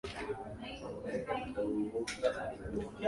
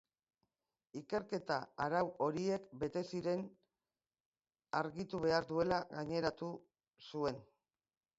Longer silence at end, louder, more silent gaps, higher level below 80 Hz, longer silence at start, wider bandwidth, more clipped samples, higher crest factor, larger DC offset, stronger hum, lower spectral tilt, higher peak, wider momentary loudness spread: second, 0 s vs 0.75 s; about the same, -39 LUFS vs -39 LUFS; second, none vs 4.20-4.32 s; first, -56 dBFS vs -70 dBFS; second, 0.05 s vs 0.95 s; first, 11.5 kHz vs 7.6 kHz; neither; about the same, 20 dB vs 22 dB; neither; neither; about the same, -5 dB/octave vs -4.5 dB/octave; about the same, -18 dBFS vs -20 dBFS; second, 8 LU vs 14 LU